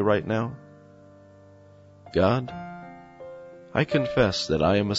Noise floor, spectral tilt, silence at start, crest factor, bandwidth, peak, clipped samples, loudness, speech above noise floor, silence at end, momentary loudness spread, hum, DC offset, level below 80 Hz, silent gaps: -51 dBFS; -6 dB/octave; 0 s; 18 dB; 8 kHz; -8 dBFS; under 0.1%; -25 LUFS; 28 dB; 0 s; 21 LU; none; under 0.1%; -50 dBFS; none